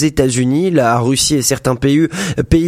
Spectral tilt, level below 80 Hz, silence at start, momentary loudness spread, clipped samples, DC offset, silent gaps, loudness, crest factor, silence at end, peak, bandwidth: -5 dB/octave; -32 dBFS; 0 s; 3 LU; under 0.1%; under 0.1%; none; -14 LUFS; 14 dB; 0 s; 0 dBFS; 16 kHz